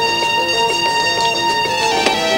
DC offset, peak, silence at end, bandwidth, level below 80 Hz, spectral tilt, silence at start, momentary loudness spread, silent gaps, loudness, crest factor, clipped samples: under 0.1%; 0 dBFS; 0 s; 16.5 kHz; -48 dBFS; -1.5 dB/octave; 0 s; 1 LU; none; -15 LUFS; 16 dB; under 0.1%